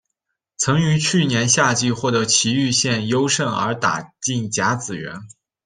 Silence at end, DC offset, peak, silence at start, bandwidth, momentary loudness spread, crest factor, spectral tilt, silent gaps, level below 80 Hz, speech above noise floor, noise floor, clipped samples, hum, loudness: 0.4 s; under 0.1%; -2 dBFS; 0.6 s; 10.5 kHz; 9 LU; 18 dB; -3.5 dB/octave; none; -56 dBFS; 59 dB; -79 dBFS; under 0.1%; none; -18 LUFS